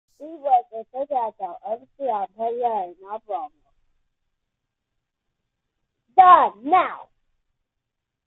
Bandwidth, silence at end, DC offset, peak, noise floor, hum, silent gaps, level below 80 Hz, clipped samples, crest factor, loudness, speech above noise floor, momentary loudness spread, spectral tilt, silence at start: 4.1 kHz; 1.25 s; under 0.1%; 0 dBFS; -81 dBFS; none; none; -70 dBFS; under 0.1%; 22 dB; -20 LUFS; 61 dB; 20 LU; -6.5 dB/octave; 0.2 s